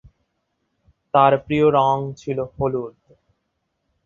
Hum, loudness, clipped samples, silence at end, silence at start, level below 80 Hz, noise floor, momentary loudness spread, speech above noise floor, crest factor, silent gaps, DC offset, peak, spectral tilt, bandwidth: none; -19 LUFS; under 0.1%; 1.15 s; 1.15 s; -52 dBFS; -74 dBFS; 11 LU; 55 dB; 20 dB; none; under 0.1%; -2 dBFS; -7.5 dB/octave; 7.4 kHz